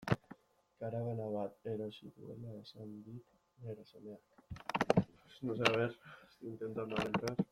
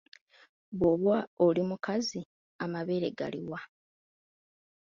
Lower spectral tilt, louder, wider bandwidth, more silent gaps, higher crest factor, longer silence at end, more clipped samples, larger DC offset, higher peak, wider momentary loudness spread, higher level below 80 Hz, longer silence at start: about the same, -6 dB/octave vs -6 dB/octave; second, -39 LUFS vs -31 LUFS; first, 15 kHz vs 7.4 kHz; second, none vs 1.27-1.37 s, 2.26-2.59 s; first, 30 dB vs 18 dB; second, 0.05 s vs 1.3 s; neither; neither; first, -10 dBFS vs -14 dBFS; first, 21 LU vs 16 LU; about the same, -66 dBFS vs -64 dBFS; second, 0 s vs 0.7 s